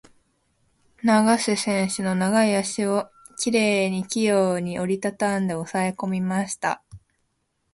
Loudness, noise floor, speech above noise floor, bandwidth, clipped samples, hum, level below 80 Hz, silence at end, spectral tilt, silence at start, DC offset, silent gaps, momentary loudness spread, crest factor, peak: -23 LUFS; -73 dBFS; 50 dB; 11.5 kHz; under 0.1%; none; -62 dBFS; 0.75 s; -4.5 dB/octave; 1.05 s; under 0.1%; none; 7 LU; 18 dB; -6 dBFS